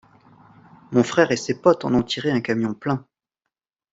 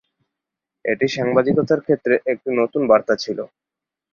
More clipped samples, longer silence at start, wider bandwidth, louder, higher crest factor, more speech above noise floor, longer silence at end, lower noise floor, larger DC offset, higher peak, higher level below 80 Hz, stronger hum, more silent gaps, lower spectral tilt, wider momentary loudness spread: neither; about the same, 0.9 s vs 0.85 s; first, 8 kHz vs 7.2 kHz; about the same, -21 LUFS vs -19 LUFS; about the same, 20 dB vs 18 dB; about the same, 63 dB vs 66 dB; first, 0.95 s vs 0.7 s; about the same, -83 dBFS vs -84 dBFS; neither; about the same, -2 dBFS vs -2 dBFS; about the same, -58 dBFS vs -62 dBFS; neither; neither; about the same, -5.5 dB/octave vs -6 dB/octave; second, 8 LU vs 11 LU